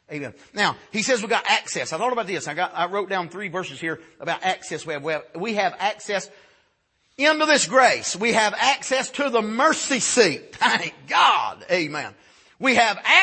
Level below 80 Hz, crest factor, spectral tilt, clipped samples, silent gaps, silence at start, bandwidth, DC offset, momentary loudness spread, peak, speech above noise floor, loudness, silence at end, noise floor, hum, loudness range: -70 dBFS; 22 dB; -2 dB/octave; under 0.1%; none; 0.1 s; 8.8 kHz; under 0.1%; 12 LU; -2 dBFS; 45 dB; -21 LUFS; 0 s; -67 dBFS; none; 7 LU